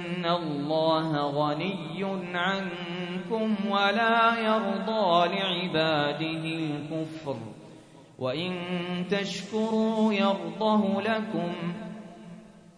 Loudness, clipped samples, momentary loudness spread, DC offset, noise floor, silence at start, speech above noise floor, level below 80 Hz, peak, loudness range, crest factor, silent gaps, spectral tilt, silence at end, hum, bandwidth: -27 LUFS; under 0.1%; 12 LU; under 0.1%; -50 dBFS; 0 s; 23 dB; -68 dBFS; -10 dBFS; 6 LU; 18 dB; none; -6 dB/octave; 0.15 s; none; 10.5 kHz